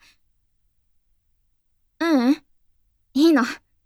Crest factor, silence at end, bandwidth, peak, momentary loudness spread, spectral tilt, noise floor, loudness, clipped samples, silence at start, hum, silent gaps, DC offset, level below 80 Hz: 18 dB; 0.3 s; 14 kHz; -6 dBFS; 10 LU; -4 dB/octave; -67 dBFS; -21 LUFS; under 0.1%; 2 s; none; none; under 0.1%; -66 dBFS